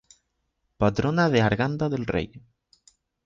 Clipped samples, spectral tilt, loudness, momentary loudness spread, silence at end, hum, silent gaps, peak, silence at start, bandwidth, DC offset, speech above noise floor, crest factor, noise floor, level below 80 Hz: under 0.1%; -7 dB/octave; -24 LUFS; 8 LU; 0.85 s; none; none; -8 dBFS; 0.8 s; 7.8 kHz; under 0.1%; 52 dB; 18 dB; -76 dBFS; -48 dBFS